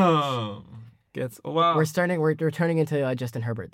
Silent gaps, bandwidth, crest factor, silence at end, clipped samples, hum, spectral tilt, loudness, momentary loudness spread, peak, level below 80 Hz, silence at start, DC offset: none; 16.5 kHz; 14 dB; 0.05 s; under 0.1%; none; -6.5 dB/octave; -25 LUFS; 13 LU; -10 dBFS; -68 dBFS; 0 s; under 0.1%